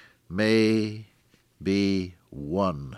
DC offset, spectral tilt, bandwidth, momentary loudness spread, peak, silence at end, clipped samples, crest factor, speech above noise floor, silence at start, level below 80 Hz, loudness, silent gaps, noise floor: under 0.1%; -6.5 dB/octave; 12 kHz; 16 LU; -10 dBFS; 0 s; under 0.1%; 18 dB; 38 dB; 0.3 s; -54 dBFS; -26 LUFS; none; -63 dBFS